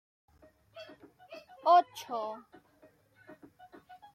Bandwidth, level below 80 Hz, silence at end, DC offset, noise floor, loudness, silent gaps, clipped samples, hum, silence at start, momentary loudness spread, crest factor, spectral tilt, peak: 15 kHz; -80 dBFS; 1.75 s; under 0.1%; -64 dBFS; -29 LUFS; none; under 0.1%; none; 0.75 s; 27 LU; 22 dB; -3.5 dB/octave; -14 dBFS